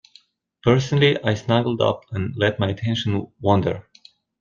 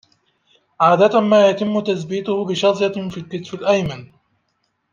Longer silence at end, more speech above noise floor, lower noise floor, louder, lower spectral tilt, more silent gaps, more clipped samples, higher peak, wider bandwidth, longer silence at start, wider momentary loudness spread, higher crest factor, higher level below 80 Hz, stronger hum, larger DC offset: second, 0.6 s vs 0.85 s; second, 35 dB vs 52 dB; second, -55 dBFS vs -69 dBFS; second, -21 LUFS vs -17 LUFS; about the same, -6.5 dB/octave vs -6 dB/octave; neither; neither; about the same, -2 dBFS vs -2 dBFS; about the same, 7.2 kHz vs 7.4 kHz; second, 0.65 s vs 0.8 s; second, 8 LU vs 14 LU; about the same, 18 dB vs 16 dB; about the same, -54 dBFS vs -58 dBFS; neither; neither